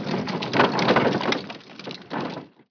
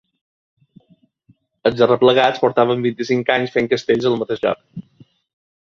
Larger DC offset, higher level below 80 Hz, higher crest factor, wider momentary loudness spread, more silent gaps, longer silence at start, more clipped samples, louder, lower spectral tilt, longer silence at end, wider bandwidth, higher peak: neither; about the same, -62 dBFS vs -58 dBFS; about the same, 20 dB vs 18 dB; first, 17 LU vs 9 LU; neither; second, 0 s vs 1.65 s; neither; second, -23 LUFS vs -17 LUFS; about the same, -5.5 dB/octave vs -6 dB/octave; second, 0.25 s vs 0.85 s; second, 5.4 kHz vs 7.2 kHz; about the same, -4 dBFS vs -2 dBFS